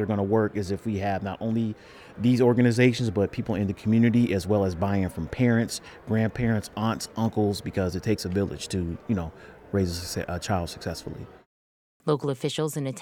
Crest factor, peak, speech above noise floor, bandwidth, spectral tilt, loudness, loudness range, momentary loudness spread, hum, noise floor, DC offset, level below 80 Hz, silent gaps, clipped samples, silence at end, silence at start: 18 dB; -8 dBFS; over 65 dB; 17 kHz; -6.5 dB/octave; -26 LUFS; 7 LU; 11 LU; none; under -90 dBFS; under 0.1%; -50 dBFS; 11.46-12.00 s; under 0.1%; 0 s; 0 s